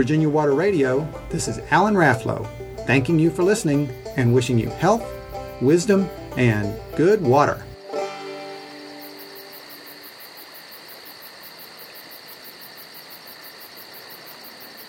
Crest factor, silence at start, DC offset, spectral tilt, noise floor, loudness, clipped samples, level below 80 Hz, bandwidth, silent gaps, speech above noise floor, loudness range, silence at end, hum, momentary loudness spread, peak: 20 dB; 0 s; under 0.1%; -6 dB/octave; -41 dBFS; -20 LUFS; under 0.1%; -48 dBFS; 17.5 kHz; none; 22 dB; 18 LU; 0 s; none; 20 LU; -4 dBFS